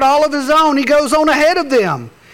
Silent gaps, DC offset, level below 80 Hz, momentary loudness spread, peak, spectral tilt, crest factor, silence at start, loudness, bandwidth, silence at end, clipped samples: none; under 0.1%; -46 dBFS; 4 LU; -6 dBFS; -4 dB/octave; 8 dB; 0 s; -12 LUFS; 17.5 kHz; 0.25 s; under 0.1%